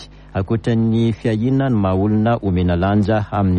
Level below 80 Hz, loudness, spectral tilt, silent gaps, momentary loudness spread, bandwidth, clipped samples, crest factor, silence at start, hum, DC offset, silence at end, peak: -38 dBFS; -18 LUFS; -9 dB/octave; none; 4 LU; 8.6 kHz; under 0.1%; 12 dB; 0 s; none; under 0.1%; 0 s; -6 dBFS